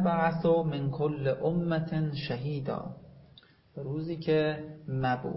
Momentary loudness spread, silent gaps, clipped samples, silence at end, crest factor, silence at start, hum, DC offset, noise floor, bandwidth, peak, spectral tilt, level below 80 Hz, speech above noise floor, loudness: 12 LU; none; under 0.1%; 0 s; 16 dB; 0 s; none; under 0.1%; -58 dBFS; 5.8 kHz; -14 dBFS; -11 dB/octave; -60 dBFS; 29 dB; -30 LUFS